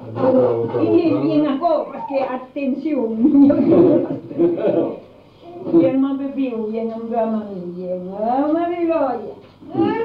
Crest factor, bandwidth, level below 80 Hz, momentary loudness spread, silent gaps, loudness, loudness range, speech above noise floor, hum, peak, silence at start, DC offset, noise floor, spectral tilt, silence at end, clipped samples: 14 dB; 5 kHz; -56 dBFS; 13 LU; none; -18 LUFS; 5 LU; 24 dB; none; -4 dBFS; 0 s; under 0.1%; -42 dBFS; -10 dB/octave; 0 s; under 0.1%